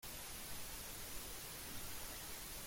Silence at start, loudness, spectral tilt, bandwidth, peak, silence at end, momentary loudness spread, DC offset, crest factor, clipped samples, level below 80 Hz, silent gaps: 0 s; -48 LUFS; -1.5 dB/octave; 16.5 kHz; -34 dBFS; 0 s; 0 LU; under 0.1%; 14 dB; under 0.1%; -58 dBFS; none